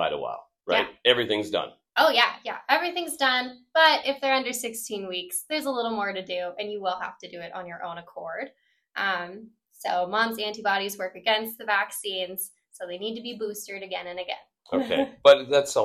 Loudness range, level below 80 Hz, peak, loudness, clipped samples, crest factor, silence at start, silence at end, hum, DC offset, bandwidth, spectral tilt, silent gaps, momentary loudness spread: 9 LU; -70 dBFS; -4 dBFS; -25 LUFS; under 0.1%; 22 dB; 0 s; 0 s; none; under 0.1%; 16 kHz; -2 dB/octave; none; 17 LU